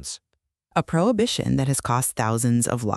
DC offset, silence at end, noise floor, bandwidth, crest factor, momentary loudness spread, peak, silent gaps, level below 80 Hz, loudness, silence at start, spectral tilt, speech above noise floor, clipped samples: under 0.1%; 0 s; -77 dBFS; 14 kHz; 18 dB; 6 LU; -4 dBFS; none; -50 dBFS; -22 LUFS; 0 s; -5 dB/octave; 55 dB; under 0.1%